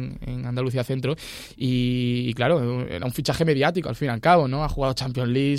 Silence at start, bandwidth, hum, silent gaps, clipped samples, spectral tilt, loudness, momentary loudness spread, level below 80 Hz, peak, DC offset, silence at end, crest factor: 0 s; 15 kHz; none; none; under 0.1%; -6.5 dB/octave; -24 LUFS; 10 LU; -42 dBFS; -6 dBFS; under 0.1%; 0 s; 18 dB